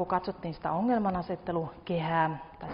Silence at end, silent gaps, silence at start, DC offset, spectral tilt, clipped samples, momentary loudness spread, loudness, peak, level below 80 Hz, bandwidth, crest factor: 0 s; none; 0 s; under 0.1%; -6 dB/octave; under 0.1%; 8 LU; -31 LUFS; -14 dBFS; -56 dBFS; 5.4 kHz; 18 dB